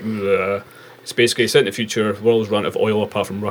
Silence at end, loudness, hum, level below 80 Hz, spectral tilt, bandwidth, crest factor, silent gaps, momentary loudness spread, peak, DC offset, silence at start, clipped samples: 0 s; -19 LUFS; none; -64 dBFS; -4.5 dB/octave; over 20 kHz; 18 dB; none; 8 LU; -2 dBFS; under 0.1%; 0 s; under 0.1%